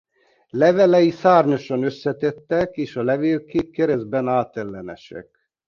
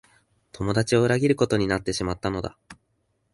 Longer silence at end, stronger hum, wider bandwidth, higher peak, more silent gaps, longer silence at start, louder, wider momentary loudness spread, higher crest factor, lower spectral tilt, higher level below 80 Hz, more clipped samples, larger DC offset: second, 0.45 s vs 0.6 s; neither; second, 7 kHz vs 11.5 kHz; first, -2 dBFS vs -6 dBFS; neither; about the same, 0.55 s vs 0.55 s; first, -19 LUFS vs -24 LUFS; first, 17 LU vs 11 LU; about the same, 18 dB vs 20 dB; first, -7.5 dB/octave vs -5.5 dB/octave; second, -56 dBFS vs -48 dBFS; neither; neither